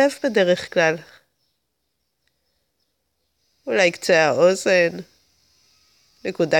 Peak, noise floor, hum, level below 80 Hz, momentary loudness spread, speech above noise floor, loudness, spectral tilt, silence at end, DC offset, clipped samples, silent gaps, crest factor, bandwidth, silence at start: -4 dBFS; -75 dBFS; none; -68 dBFS; 15 LU; 56 dB; -19 LUFS; -4 dB/octave; 0 s; under 0.1%; under 0.1%; none; 18 dB; 16.5 kHz; 0 s